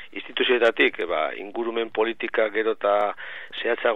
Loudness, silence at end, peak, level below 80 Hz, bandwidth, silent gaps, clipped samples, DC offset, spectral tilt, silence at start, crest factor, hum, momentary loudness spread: -24 LUFS; 0 s; -6 dBFS; -68 dBFS; 8 kHz; none; under 0.1%; 0.7%; -4.5 dB/octave; 0 s; 18 dB; none; 10 LU